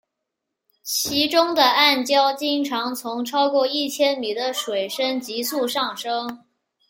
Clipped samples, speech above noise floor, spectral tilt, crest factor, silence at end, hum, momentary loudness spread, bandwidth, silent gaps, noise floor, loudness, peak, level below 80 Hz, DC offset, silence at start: under 0.1%; 60 dB; -1.5 dB/octave; 20 dB; 0.5 s; none; 10 LU; 17 kHz; none; -81 dBFS; -21 LUFS; -2 dBFS; -70 dBFS; under 0.1%; 0.85 s